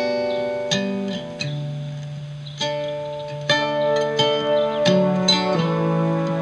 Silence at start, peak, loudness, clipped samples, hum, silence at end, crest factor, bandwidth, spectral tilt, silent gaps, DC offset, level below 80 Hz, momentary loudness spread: 0 s; -6 dBFS; -21 LUFS; under 0.1%; none; 0 s; 16 dB; 11.5 kHz; -5 dB/octave; none; under 0.1%; -58 dBFS; 12 LU